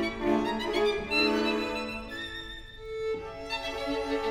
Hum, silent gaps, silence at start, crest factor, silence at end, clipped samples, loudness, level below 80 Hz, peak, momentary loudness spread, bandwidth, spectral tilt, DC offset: none; none; 0 s; 16 dB; 0 s; under 0.1%; -30 LUFS; -48 dBFS; -14 dBFS; 12 LU; 15.5 kHz; -4.5 dB/octave; under 0.1%